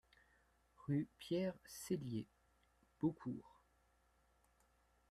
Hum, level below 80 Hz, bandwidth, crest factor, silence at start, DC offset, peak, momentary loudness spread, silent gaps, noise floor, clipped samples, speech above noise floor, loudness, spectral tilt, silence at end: none; -76 dBFS; 13.5 kHz; 20 dB; 0.8 s; under 0.1%; -26 dBFS; 11 LU; none; -77 dBFS; under 0.1%; 34 dB; -45 LUFS; -6.5 dB/octave; 1.6 s